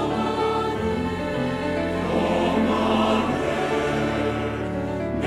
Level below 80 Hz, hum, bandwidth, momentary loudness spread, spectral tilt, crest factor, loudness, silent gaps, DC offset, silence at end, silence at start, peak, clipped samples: -42 dBFS; none; 14.5 kHz; 6 LU; -6.5 dB/octave; 14 dB; -23 LUFS; none; under 0.1%; 0 s; 0 s; -10 dBFS; under 0.1%